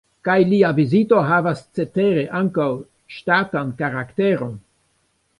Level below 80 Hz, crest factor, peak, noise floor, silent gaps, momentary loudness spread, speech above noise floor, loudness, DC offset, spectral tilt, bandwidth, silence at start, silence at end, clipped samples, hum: -60 dBFS; 18 dB; -2 dBFS; -66 dBFS; none; 12 LU; 47 dB; -19 LUFS; under 0.1%; -8 dB/octave; 11 kHz; 0.25 s; 0.8 s; under 0.1%; none